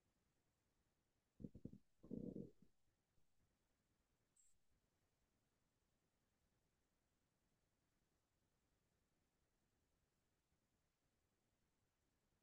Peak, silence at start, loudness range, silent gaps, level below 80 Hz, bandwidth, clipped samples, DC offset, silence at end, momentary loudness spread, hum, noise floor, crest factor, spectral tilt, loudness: -40 dBFS; 1.4 s; 1 LU; none; -84 dBFS; 2.6 kHz; under 0.1%; under 0.1%; 7.9 s; 9 LU; none; -89 dBFS; 28 dB; -11 dB/octave; -58 LUFS